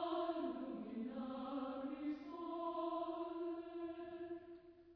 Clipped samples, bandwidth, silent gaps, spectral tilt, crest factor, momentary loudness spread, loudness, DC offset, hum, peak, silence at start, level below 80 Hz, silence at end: under 0.1%; 5.4 kHz; none; -4.5 dB/octave; 16 dB; 8 LU; -46 LUFS; under 0.1%; none; -30 dBFS; 0 s; -78 dBFS; 0 s